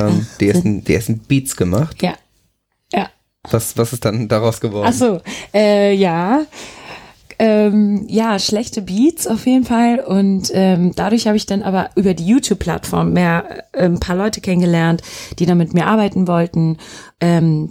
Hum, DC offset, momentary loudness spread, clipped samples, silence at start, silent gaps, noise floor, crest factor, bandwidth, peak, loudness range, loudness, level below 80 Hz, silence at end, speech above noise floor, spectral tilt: none; under 0.1%; 8 LU; under 0.1%; 0 s; none; -64 dBFS; 14 dB; 16.5 kHz; -2 dBFS; 4 LU; -16 LUFS; -42 dBFS; 0 s; 49 dB; -6 dB/octave